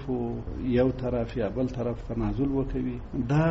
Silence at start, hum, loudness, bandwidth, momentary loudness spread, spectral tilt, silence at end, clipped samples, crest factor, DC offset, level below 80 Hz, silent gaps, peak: 0 s; none; -29 LUFS; 7.6 kHz; 7 LU; -8 dB/octave; 0 s; under 0.1%; 14 dB; under 0.1%; -38 dBFS; none; -12 dBFS